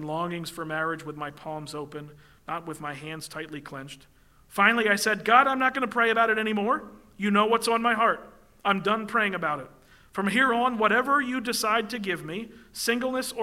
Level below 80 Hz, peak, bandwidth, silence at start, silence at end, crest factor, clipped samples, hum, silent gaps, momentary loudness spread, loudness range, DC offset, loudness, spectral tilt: -62 dBFS; -4 dBFS; 16 kHz; 0 s; 0 s; 22 dB; under 0.1%; none; none; 16 LU; 11 LU; under 0.1%; -25 LUFS; -4 dB/octave